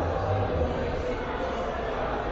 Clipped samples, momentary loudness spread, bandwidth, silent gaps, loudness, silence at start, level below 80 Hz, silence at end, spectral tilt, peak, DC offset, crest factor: under 0.1%; 3 LU; 7.6 kHz; none; -29 LUFS; 0 s; -38 dBFS; 0 s; -5.5 dB/octave; -14 dBFS; under 0.1%; 14 dB